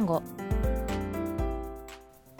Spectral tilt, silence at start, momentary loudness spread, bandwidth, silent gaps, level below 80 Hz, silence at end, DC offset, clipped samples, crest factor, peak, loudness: -7.5 dB/octave; 0 s; 15 LU; 19 kHz; none; -36 dBFS; 0 s; under 0.1%; under 0.1%; 16 dB; -16 dBFS; -32 LUFS